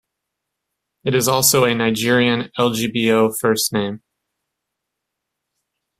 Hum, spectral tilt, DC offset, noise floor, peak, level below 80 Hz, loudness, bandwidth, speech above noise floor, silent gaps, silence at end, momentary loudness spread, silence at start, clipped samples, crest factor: none; -3.5 dB/octave; under 0.1%; -80 dBFS; -2 dBFS; -58 dBFS; -17 LUFS; 16 kHz; 63 dB; none; 2 s; 9 LU; 1.05 s; under 0.1%; 18 dB